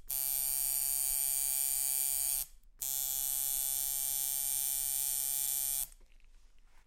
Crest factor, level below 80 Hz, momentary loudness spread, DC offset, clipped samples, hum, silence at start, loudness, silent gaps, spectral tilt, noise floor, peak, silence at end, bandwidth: 18 dB; -58 dBFS; 4 LU; under 0.1%; under 0.1%; none; 0.05 s; -31 LUFS; none; 2.5 dB/octave; -58 dBFS; -18 dBFS; 0.25 s; 17 kHz